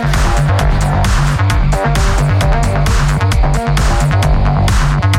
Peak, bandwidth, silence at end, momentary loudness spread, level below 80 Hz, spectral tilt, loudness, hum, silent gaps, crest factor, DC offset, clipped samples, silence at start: -2 dBFS; 15 kHz; 0 s; 1 LU; -14 dBFS; -5.5 dB/octave; -13 LUFS; none; none; 8 dB; under 0.1%; under 0.1%; 0 s